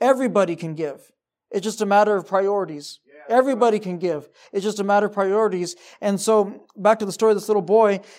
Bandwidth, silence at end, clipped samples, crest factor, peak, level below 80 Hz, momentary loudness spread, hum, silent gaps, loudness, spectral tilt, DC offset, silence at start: 15.5 kHz; 0.15 s; under 0.1%; 16 dB; -4 dBFS; -80 dBFS; 12 LU; none; none; -21 LUFS; -5 dB/octave; under 0.1%; 0 s